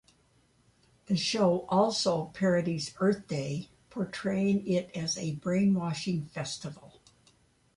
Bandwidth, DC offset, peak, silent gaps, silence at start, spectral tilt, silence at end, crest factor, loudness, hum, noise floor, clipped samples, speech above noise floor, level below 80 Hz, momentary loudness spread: 11.5 kHz; under 0.1%; -14 dBFS; none; 1.1 s; -5.5 dB/octave; 0.9 s; 18 dB; -30 LUFS; none; -67 dBFS; under 0.1%; 37 dB; -64 dBFS; 10 LU